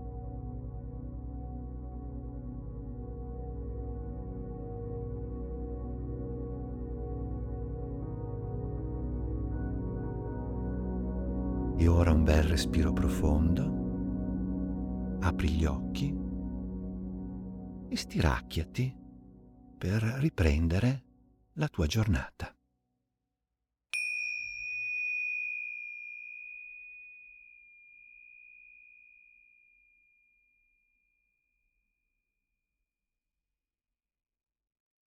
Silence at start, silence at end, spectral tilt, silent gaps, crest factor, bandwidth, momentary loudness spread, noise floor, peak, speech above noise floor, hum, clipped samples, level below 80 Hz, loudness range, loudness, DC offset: 0 s; 6.3 s; -6.5 dB/octave; none; 22 dB; 15 kHz; 17 LU; under -90 dBFS; -12 dBFS; over 62 dB; none; under 0.1%; -40 dBFS; 13 LU; -34 LUFS; under 0.1%